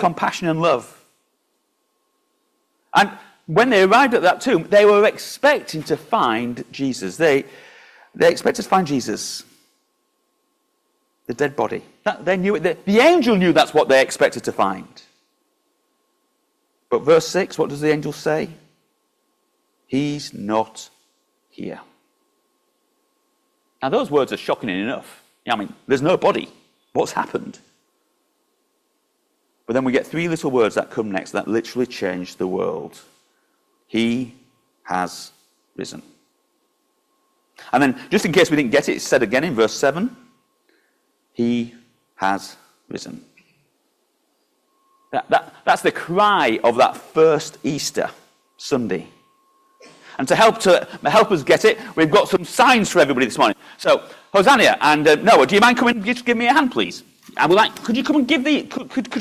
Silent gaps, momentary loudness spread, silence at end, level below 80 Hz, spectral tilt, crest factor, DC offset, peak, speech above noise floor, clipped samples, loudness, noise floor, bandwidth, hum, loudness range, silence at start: none; 15 LU; 0 s; -60 dBFS; -4.5 dB/octave; 18 dB; under 0.1%; -2 dBFS; 51 dB; under 0.1%; -18 LUFS; -69 dBFS; 15.5 kHz; none; 12 LU; 0 s